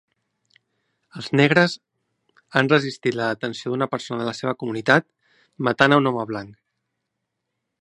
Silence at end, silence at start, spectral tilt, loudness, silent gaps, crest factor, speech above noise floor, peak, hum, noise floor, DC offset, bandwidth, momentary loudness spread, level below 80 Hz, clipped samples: 1.3 s; 1.15 s; -6 dB/octave; -21 LUFS; none; 24 dB; 59 dB; 0 dBFS; none; -79 dBFS; under 0.1%; 11 kHz; 12 LU; -66 dBFS; under 0.1%